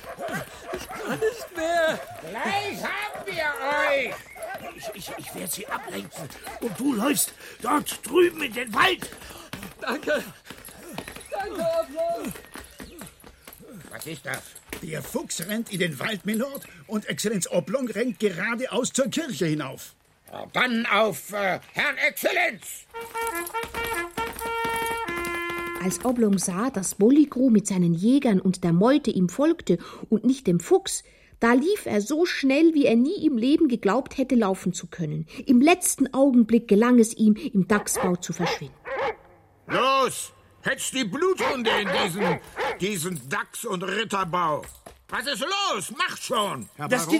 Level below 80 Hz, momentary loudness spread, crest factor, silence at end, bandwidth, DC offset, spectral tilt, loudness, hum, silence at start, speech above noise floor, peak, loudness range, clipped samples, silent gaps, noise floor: -56 dBFS; 16 LU; 20 dB; 0 s; 16.5 kHz; under 0.1%; -4.5 dB/octave; -24 LUFS; none; 0 s; 30 dB; -6 dBFS; 9 LU; under 0.1%; none; -54 dBFS